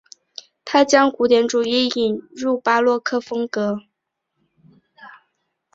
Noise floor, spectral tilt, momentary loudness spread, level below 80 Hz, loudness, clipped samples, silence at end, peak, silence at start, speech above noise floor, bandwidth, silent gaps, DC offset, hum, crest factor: -77 dBFS; -3.5 dB/octave; 17 LU; -64 dBFS; -18 LUFS; under 0.1%; 0.65 s; -2 dBFS; 0.65 s; 59 dB; 8 kHz; none; under 0.1%; none; 20 dB